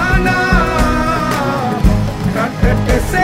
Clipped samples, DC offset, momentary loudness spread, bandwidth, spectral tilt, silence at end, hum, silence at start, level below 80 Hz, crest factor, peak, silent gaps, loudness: under 0.1%; under 0.1%; 4 LU; 16 kHz; -6 dB/octave; 0 s; none; 0 s; -20 dBFS; 14 dB; 0 dBFS; none; -14 LUFS